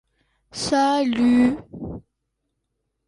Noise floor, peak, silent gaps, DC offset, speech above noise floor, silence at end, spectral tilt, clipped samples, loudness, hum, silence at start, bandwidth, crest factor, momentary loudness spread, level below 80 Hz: -77 dBFS; -8 dBFS; none; under 0.1%; 57 dB; 1.05 s; -4.5 dB/octave; under 0.1%; -20 LUFS; none; 0.55 s; 11.5 kHz; 14 dB; 19 LU; -50 dBFS